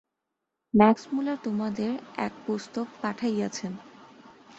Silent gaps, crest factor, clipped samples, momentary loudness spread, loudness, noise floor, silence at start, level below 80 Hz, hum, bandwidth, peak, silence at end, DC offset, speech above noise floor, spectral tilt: none; 24 dB; under 0.1%; 14 LU; -28 LUFS; -84 dBFS; 0.75 s; -66 dBFS; none; 8 kHz; -4 dBFS; 0.55 s; under 0.1%; 57 dB; -6 dB/octave